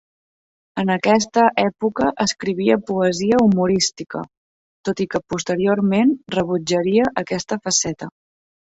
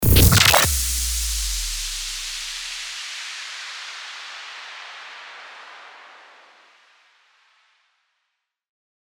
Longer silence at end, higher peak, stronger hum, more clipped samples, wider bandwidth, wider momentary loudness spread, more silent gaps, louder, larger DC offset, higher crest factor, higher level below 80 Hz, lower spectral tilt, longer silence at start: second, 0.65 s vs 2.95 s; about the same, -2 dBFS vs -2 dBFS; neither; neither; second, 8 kHz vs over 20 kHz; second, 12 LU vs 25 LU; first, 4.37-4.84 s vs none; about the same, -19 LUFS vs -20 LUFS; neither; about the same, 18 dB vs 22 dB; second, -54 dBFS vs -32 dBFS; first, -4.5 dB/octave vs -2.5 dB/octave; first, 0.75 s vs 0 s